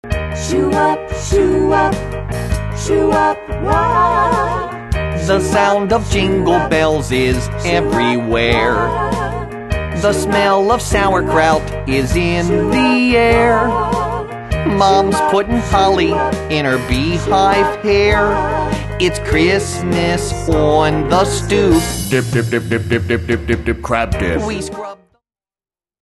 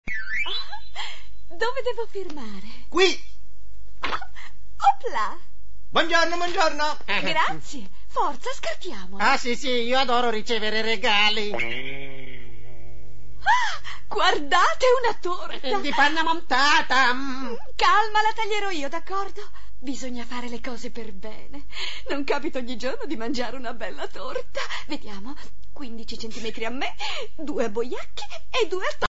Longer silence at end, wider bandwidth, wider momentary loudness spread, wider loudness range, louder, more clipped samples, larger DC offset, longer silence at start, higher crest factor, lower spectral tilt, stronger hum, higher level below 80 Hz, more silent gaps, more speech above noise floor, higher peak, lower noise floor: first, 1.15 s vs 0 s; first, 12.5 kHz vs 8 kHz; second, 8 LU vs 18 LU; second, 2 LU vs 11 LU; first, -15 LUFS vs -25 LUFS; neither; second, under 0.1% vs 9%; about the same, 0.05 s vs 0 s; second, 14 dB vs 20 dB; first, -5.5 dB/octave vs -3 dB/octave; neither; first, -28 dBFS vs -48 dBFS; neither; first, over 76 dB vs 23 dB; first, 0 dBFS vs -4 dBFS; first, under -90 dBFS vs -48 dBFS